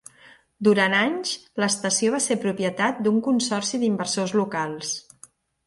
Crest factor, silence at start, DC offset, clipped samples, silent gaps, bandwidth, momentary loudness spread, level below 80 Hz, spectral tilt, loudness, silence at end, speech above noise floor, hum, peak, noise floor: 18 dB; 0.6 s; under 0.1%; under 0.1%; none; 11.5 kHz; 8 LU; -68 dBFS; -3.5 dB/octave; -23 LUFS; 0.65 s; 30 dB; none; -6 dBFS; -53 dBFS